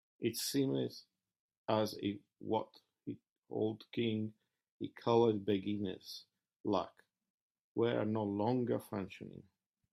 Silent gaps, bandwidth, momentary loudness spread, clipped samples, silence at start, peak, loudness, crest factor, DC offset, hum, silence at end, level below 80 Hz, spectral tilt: 1.40-1.49 s, 1.57-1.65 s, 3.32-3.36 s, 4.71-4.80 s, 6.60-6.64 s, 7.30-7.55 s, 7.61-7.75 s; 15.5 kHz; 16 LU; under 0.1%; 0.2 s; -18 dBFS; -37 LUFS; 20 dB; under 0.1%; none; 0.5 s; -78 dBFS; -6 dB/octave